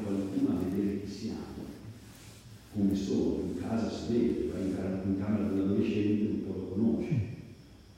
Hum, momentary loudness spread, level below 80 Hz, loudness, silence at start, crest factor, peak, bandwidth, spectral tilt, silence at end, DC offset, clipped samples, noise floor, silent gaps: none; 18 LU; -56 dBFS; -32 LUFS; 0 s; 16 dB; -16 dBFS; 15.5 kHz; -8 dB/octave; 0.05 s; under 0.1%; under 0.1%; -52 dBFS; none